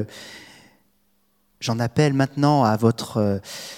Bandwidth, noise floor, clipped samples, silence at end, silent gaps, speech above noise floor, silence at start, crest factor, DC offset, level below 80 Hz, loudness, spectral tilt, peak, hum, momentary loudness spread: 16.5 kHz; -67 dBFS; under 0.1%; 0 s; none; 46 dB; 0 s; 18 dB; under 0.1%; -62 dBFS; -21 LUFS; -6.5 dB/octave; -4 dBFS; none; 19 LU